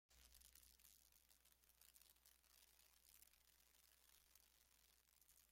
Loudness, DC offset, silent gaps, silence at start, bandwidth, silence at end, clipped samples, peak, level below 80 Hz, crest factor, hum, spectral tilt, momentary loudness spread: -69 LUFS; under 0.1%; none; 0.1 s; 16.5 kHz; 0 s; under 0.1%; -48 dBFS; -84 dBFS; 26 dB; none; -0.5 dB/octave; 2 LU